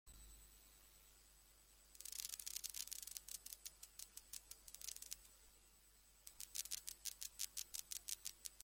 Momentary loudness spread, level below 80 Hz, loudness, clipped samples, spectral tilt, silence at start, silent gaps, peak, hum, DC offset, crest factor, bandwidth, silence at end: 20 LU; -72 dBFS; -50 LUFS; under 0.1%; 1.5 dB/octave; 0.05 s; none; -22 dBFS; none; under 0.1%; 32 dB; 16.5 kHz; 0 s